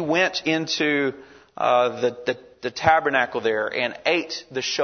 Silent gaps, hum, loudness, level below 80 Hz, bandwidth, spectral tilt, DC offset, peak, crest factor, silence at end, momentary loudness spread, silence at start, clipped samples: none; none; -22 LUFS; -58 dBFS; 6.6 kHz; -3.5 dB/octave; under 0.1%; -2 dBFS; 22 dB; 0 s; 10 LU; 0 s; under 0.1%